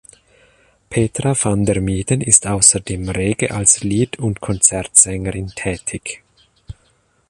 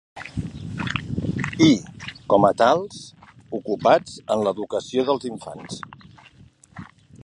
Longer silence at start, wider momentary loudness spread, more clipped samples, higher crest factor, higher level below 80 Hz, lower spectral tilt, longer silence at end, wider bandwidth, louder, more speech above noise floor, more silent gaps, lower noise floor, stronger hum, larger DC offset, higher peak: first, 0.9 s vs 0.15 s; second, 13 LU vs 19 LU; neither; about the same, 18 dB vs 20 dB; first, -38 dBFS vs -48 dBFS; second, -4 dB/octave vs -6 dB/octave; first, 0.6 s vs 0 s; first, 14 kHz vs 11 kHz; first, -15 LUFS vs -22 LUFS; first, 42 dB vs 31 dB; neither; first, -59 dBFS vs -51 dBFS; neither; neither; about the same, 0 dBFS vs -2 dBFS